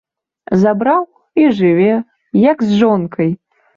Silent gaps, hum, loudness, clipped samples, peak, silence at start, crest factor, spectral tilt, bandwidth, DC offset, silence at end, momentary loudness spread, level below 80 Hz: none; none; -14 LUFS; under 0.1%; -2 dBFS; 0.5 s; 12 dB; -8.5 dB/octave; 7.2 kHz; under 0.1%; 0.4 s; 7 LU; -54 dBFS